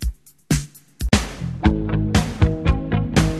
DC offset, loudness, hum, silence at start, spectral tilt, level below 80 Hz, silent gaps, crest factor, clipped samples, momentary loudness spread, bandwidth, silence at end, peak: under 0.1%; -21 LUFS; none; 0 s; -5.5 dB/octave; -26 dBFS; none; 20 dB; under 0.1%; 10 LU; 13.5 kHz; 0 s; 0 dBFS